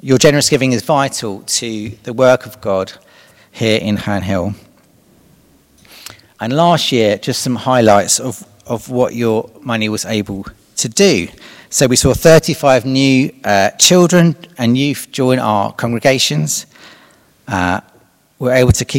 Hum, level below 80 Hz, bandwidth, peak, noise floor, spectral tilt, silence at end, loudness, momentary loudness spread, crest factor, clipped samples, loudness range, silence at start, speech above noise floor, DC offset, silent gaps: none; -40 dBFS; over 20 kHz; 0 dBFS; -51 dBFS; -4 dB/octave; 0 s; -13 LUFS; 15 LU; 14 dB; 0.3%; 8 LU; 0.05 s; 38 dB; under 0.1%; none